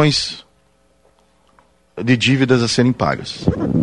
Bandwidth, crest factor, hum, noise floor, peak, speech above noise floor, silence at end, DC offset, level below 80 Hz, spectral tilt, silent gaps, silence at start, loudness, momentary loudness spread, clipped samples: 11.5 kHz; 18 dB; none; -58 dBFS; -2 dBFS; 42 dB; 0 s; under 0.1%; -42 dBFS; -5 dB/octave; none; 0 s; -17 LUFS; 11 LU; under 0.1%